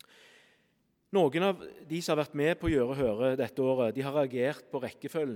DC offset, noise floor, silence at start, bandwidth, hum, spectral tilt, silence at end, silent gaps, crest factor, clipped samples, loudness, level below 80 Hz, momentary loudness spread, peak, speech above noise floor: under 0.1%; -73 dBFS; 1.1 s; 17.5 kHz; none; -6 dB/octave; 0 s; none; 18 dB; under 0.1%; -30 LUFS; -56 dBFS; 9 LU; -14 dBFS; 43 dB